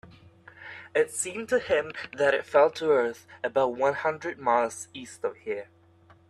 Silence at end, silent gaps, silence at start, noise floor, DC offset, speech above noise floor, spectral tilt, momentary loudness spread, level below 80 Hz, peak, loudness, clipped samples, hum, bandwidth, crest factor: 0.65 s; none; 0.05 s; -58 dBFS; under 0.1%; 31 dB; -3 dB/octave; 14 LU; -68 dBFS; -8 dBFS; -27 LUFS; under 0.1%; none; 13 kHz; 20 dB